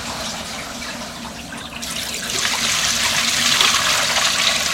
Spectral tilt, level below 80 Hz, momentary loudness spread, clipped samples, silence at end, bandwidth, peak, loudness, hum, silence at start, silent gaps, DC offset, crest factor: 0 dB/octave; -46 dBFS; 16 LU; under 0.1%; 0 s; 16.5 kHz; 0 dBFS; -17 LUFS; none; 0 s; none; under 0.1%; 20 dB